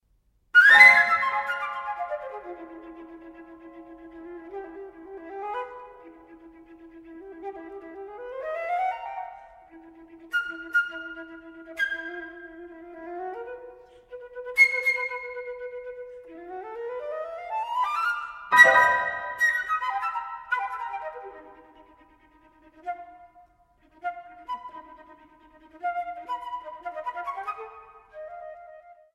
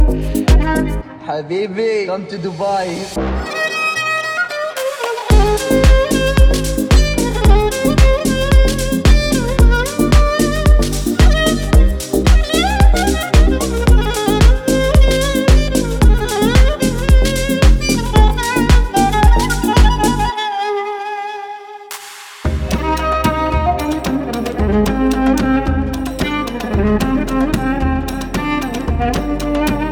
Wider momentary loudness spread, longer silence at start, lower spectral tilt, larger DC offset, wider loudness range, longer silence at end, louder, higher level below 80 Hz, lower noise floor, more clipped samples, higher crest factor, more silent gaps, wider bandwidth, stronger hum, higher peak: first, 25 LU vs 8 LU; first, 0.55 s vs 0 s; second, -1.5 dB/octave vs -5.5 dB/octave; neither; first, 19 LU vs 5 LU; first, 0.2 s vs 0 s; second, -22 LUFS vs -15 LUFS; second, -66 dBFS vs -16 dBFS; first, -67 dBFS vs -33 dBFS; neither; first, 26 dB vs 12 dB; neither; second, 16 kHz vs 18 kHz; neither; about the same, -2 dBFS vs 0 dBFS